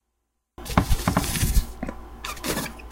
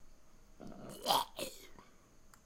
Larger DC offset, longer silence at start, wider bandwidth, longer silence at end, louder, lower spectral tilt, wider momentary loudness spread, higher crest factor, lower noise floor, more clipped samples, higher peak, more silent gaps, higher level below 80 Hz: neither; first, 0.6 s vs 0 s; about the same, 17 kHz vs 16.5 kHz; about the same, 0 s vs 0.1 s; first, -26 LUFS vs -37 LUFS; first, -4.5 dB/octave vs -2 dB/octave; second, 13 LU vs 22 LU; second, 24 dB vs 30 dB; first, -77 dBFS vs -61 dBFS; neither; first, -2 dBFS vs -14 dBFS; neither; first, -28 dBFS vs -62 dBFS